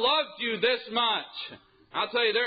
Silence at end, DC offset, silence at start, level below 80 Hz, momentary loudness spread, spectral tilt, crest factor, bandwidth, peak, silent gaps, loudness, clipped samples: 0 s; under 0.1%; 0 s; -72 dBFS; 13 LU; -6.5 dB/octave; 16 dB; 5 kHz; -12 dBFS; none; -27 LUFS; under 0.1%